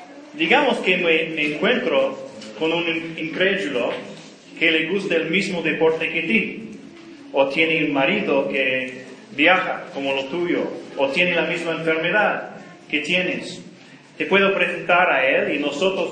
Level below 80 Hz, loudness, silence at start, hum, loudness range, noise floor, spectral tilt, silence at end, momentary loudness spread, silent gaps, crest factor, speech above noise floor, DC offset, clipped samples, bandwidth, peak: -68 dBFS; -20 LUFS; 0 s; none; 2 LU; -45 dBFS; -5 dB/octave; 0 s; 15 LU; none; 22 dB; 24 dB; under 0.1%; under 0.1%; 9.8 kHz; 0 dBFS